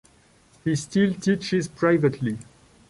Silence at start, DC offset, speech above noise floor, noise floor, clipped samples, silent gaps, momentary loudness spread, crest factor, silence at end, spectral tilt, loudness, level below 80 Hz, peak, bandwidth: 0.65 s; under 0.1%; 34 dB; -57 dBFS; under 0.1%; none; 10 LU; 16 dB; 0.5 s; -6 dB/octave; -24 LUFS; -58 dBFS; -8 dBFS; 11.5 kHz